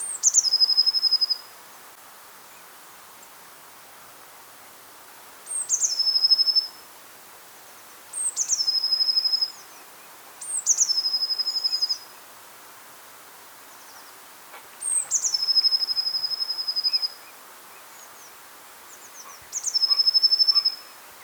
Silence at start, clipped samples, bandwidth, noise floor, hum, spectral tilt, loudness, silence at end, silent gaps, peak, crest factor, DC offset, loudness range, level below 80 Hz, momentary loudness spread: 0 s; under 0.1%; over 20 kHz; -47 dBFS; none; 4 dB/octave; -20 LUFS; 0 s; none; -6 dBFS; 22 dB; under 0.1%; 11 LU; -80 dBFS; 26 LU